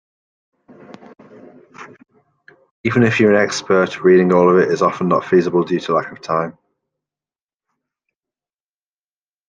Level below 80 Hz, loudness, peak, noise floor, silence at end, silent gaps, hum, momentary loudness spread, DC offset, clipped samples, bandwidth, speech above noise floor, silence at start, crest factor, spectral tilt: -60 dBFS; -15 LUFS; -2 dBFS; under -90 dBFS; 2.95 s; 2.71-2.84 s; none; 9 LU; under 0.1%; under 0.1%; 9.2 kHz; over 75 dB; 0.9 s; 16 dB; -6.5 dB/octave